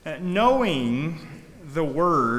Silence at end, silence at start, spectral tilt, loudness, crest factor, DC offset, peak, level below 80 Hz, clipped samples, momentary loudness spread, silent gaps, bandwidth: 0 s; 0.05 s; -6.5 dB/octave; -23 LUFS; 16 dB; under 0.1%; -8 dBFS; -52 dBFS; under 0.1%; 19 LU; none; 14.5 kHz